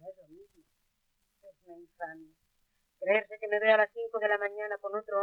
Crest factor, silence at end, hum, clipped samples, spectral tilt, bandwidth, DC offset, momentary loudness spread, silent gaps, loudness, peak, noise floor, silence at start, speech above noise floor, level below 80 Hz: 22 dB; 0 s; none; under 0.1%; -5 dB/octave; 4.6 kHz; under 0.1%; 18 LU; none; -30 LUFS; -12 dBFS; -77 dBFS; 0.05 s; 46 dB; -80 dBFS